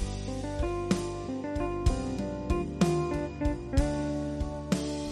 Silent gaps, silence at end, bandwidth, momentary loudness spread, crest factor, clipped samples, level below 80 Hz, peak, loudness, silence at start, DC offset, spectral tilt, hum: none; 0 s; 13.5 kHz; 7 LU; 20 dB; under 0.1%; -36 dBFS; -10 dBFS; -31 LUFS; 0 s; under 0.1%; -6.5 dB/octave; none